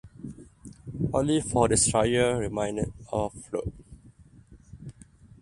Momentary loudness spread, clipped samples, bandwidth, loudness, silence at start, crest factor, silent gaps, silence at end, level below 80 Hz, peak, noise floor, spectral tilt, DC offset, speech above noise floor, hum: 24 LU; under 0.1%; 11.5 kHz; -26 LUFS; 0.05 s; 20 dB; none; 0.15 s; -46 dBFS; -8 dBFS; -53 dBFS; -4.5 dB/octave; under 0.1%; 28 dB; none